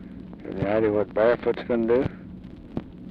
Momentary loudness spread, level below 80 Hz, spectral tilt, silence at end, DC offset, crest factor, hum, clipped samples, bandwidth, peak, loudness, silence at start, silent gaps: 19 LU; -48 dBFS; -9.5 dB/octave; 0 s; under 0.1%; 18 dB; none; under 0.1%; 5.4 kHz; -8 dBFS; -24 LUFS; 0 s; none